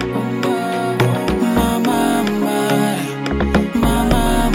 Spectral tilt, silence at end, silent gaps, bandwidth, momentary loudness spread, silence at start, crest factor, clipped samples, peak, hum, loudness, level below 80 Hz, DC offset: -5.5 dB/octave; 0 s; none; 16.5 kHz; 4 LU; 0 s; 16 dB; under 0.1%; 0 dBFS; none; -17 LUFS; -26 dBFS; under 0.1%